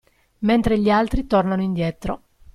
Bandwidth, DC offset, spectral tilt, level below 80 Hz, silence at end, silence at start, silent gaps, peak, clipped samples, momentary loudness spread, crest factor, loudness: 12.5 kHz; under 0.1%; -7.5 dB/octave; -34 dBFS; 0.35 s; 0.4 s; none; -6 dBFS; under 0.1%; 12 LU; 14 dB; -21 LUFS